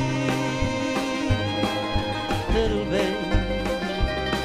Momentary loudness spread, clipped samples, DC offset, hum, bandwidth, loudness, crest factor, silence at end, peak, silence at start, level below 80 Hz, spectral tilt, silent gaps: 3 LU; under 0.1%; under 0.1%; none; 15.5 kHz; -25 LUFS; 16 dB; 0 s; -8 dBFS; 0 s; -32 dBFS; -5.5 dB/octave; none